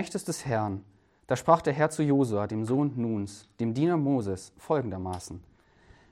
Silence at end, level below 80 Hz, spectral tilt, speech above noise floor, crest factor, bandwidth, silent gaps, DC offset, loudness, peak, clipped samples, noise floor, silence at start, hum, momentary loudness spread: 0.7 s; -62 dBFS; -6.5 dB/octave; 31 dB; 22 dB; 14 kHz; none; under 0.1%; -28 LUFS; -6 dBFS; under 0.1%; -58 dBFS; 0 s; none; 14 LU